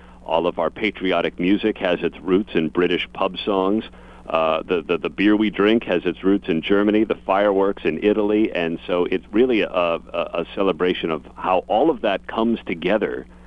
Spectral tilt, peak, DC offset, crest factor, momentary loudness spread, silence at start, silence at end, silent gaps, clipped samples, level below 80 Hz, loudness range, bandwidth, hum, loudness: -7.5 dB/octave; -2 dBFS; under 0.1%; 18 dB; 6 LU; 0.05 s; 0.05 s; none; under 0.1%; -48 dBFS; 2 LU; 6 kHz; none; -21 LUFS